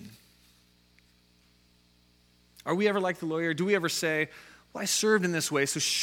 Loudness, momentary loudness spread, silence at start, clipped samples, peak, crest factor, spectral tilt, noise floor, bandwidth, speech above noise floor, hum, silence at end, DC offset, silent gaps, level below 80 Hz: -28 LUFS; 9 LU; 0 s; under 0.1%; -12 dBFS; 20 dB; -3 dB/octave; -64 dBFS; 17 kHz; 36 dB; 60 Hz at -60 dBFS; 0 s; under 0.1%; none; -70 dBFS